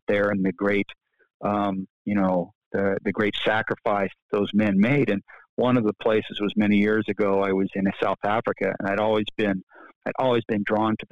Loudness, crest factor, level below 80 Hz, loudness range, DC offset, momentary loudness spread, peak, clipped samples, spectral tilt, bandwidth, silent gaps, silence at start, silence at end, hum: -24 LUFS; 14 dB; -62 dBFS; 3 LU; 0.3%; 7 LU; -10 dBFS; under 0.1%; -8 dB/octave; 6.8 kHz; 1.34-1.40 s, 1.90-2.05 s, 2.55-2.71 s, 4.22-4.29 s, 5.49-5.57 s, 9.63-9.67 s, 9.96-10.01 s; 0.1 s; 0.05 s; none